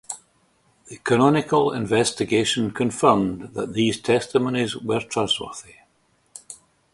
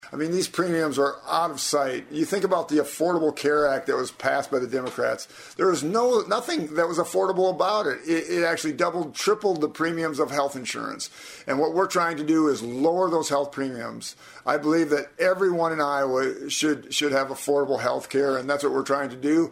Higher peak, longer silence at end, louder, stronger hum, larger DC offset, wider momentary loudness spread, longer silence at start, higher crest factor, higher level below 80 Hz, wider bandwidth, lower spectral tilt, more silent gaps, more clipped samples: first, -2 dBFS vs -6 dBFS; first, 0.4 s vs 0 s; first, -21 LUFS vs -24 LUFS; neither; neither; first, 17 LU vs 6 LU; about the same, 0.1 s vs 0.05 s; about the same, 22 dB vs 18 dB; first, -56 dBFS vs -68 dBFS; second, 11.5 kHz vs 16 kHz; about the same, -4.5 dB/octave vs -4 dB/octave; neither; neither